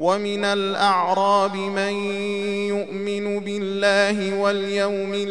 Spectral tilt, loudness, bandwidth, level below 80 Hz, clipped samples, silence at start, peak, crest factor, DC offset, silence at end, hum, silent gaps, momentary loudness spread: -4.5 dB/octave; -22 LUFS; 11 kHz; -70 dBFS; under 0.1%; 0 s; -4 dBFS; 18 dB; 0.4%; 0 s; none; none; 7 LU